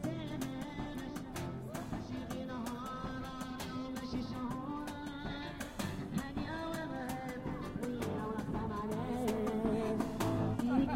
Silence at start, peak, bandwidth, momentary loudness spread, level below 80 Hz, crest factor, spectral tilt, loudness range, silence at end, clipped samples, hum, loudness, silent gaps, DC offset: 0 s; -18 dBFS; 16.5 kHz; 8 LU; -54 dBFS; 20 dB; -6 dB/octave; 5 LU; 0 s; under 0.1%; none; -39 LUFS; none; under 0.1%